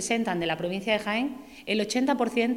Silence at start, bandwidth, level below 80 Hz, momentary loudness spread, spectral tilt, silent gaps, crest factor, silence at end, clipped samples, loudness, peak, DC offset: 0 s; 16.5 kHz; -62 dBFS; 5 LU; -4 dB/octave; none; 16 dB; 0 s; under 0.1%; -27 LUFS; -10 dBFS; under 0.1%